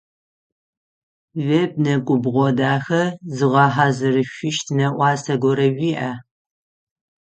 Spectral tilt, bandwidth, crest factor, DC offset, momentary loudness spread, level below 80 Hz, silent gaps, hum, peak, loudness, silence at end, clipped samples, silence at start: -6 dB/octave; 8.8 kHz; 20 dB; under 0.1%; 8 LU; -62 dBFS; none; none; 0 dBFS; -19 LUFS; 1 s; under 0.1%; 1.35 s